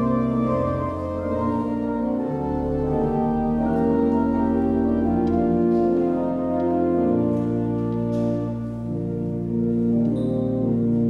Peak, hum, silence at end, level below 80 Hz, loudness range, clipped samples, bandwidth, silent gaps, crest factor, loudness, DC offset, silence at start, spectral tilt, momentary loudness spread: -8 dBFS; none; 0 s; -40 dBFS; 3 LU; under 0.1%; 5 kHz; none; 12 dB; -23 LUFS; under 0.1%; 0 s; -10.5 dB/octave; 6 LU